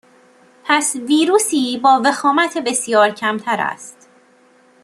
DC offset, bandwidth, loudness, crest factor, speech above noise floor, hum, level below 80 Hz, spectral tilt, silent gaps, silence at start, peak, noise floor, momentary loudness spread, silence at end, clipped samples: under 0.1%; 13 kHz; -16 LUFS; 16 dB; 36 dB; none; -70 dBFS; -2 dB/octave; none; 0.65 s; -2 dBFS; -52 dBFS; 9 LU; 0.9 s; under 0.1%